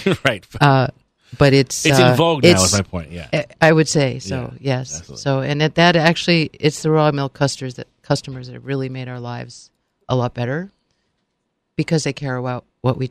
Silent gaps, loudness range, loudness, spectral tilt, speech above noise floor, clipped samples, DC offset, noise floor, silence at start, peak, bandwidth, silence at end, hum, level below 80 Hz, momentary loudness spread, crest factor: none; 10 LU; -17 LUFS; -5 dB/octave; 55 dB; under 0.1%; under 0.1%; -73 dBFS; 0 s; 0 dBFS; 15.5 kHz; 0 s; none; -48 dBFS; 16 LU; 18 dB